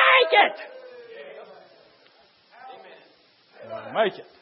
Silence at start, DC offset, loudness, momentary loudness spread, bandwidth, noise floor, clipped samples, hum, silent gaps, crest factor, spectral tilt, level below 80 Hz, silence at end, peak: 0 s; under 0.1%; -20 LUFS; 28 LU; 5.8 kHz; -58 dBFS; under 0.1%; none; none; 22 dB; -6.5 dB/octave; -86 dBFS; 0.2 s; -4 dBFS